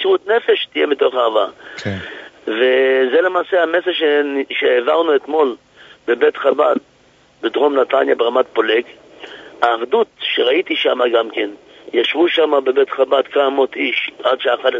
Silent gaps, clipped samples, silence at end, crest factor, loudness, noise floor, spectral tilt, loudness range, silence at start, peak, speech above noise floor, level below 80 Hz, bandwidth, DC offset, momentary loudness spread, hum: none; under 0.1%; 0 s; 16 dB; -16 LUFS; -51 dBFS; -5.5 dB/octave; 2 LU; 0 s; 0 dBFS; 36 dB; -68 dBFS; 7.6 kHz; under 0.1%; 11 LU; none